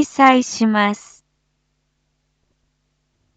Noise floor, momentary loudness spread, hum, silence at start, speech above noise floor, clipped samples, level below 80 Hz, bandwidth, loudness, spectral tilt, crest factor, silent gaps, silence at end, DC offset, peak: -69 dBFS; 9 LU; none; 0 s; 54 dB; under 0.1%; -66 dBFS; 8.8 kHz; -15 LUFS; -4 dB/octave; 20 dB; none; 2.4 s; under 0.1%; 0 dBFS